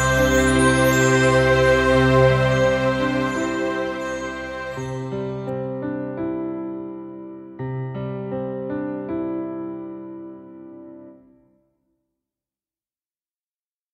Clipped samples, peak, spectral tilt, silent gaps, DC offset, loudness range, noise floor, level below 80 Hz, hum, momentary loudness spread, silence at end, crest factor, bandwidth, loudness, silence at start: under 0.1%; -2 dBFS; -5.5 dB/octave; none; under 0.1%; 16 LU; under -90 dBFS; -38 dBFS; none; 20 LU; 2.8 s; 20 dB; 15 kHz; -21 LUFS; 0 s